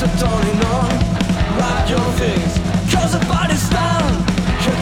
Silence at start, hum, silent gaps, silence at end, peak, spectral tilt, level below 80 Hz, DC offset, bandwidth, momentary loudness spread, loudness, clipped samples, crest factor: 0 s; none; none; 0 s; -4 dBFS; -5.5 dB/octave; -24 dBFS; under 0.1%; 16.5 kHz; 1 LU; -17 LUFS; under 0.1%; 12 dB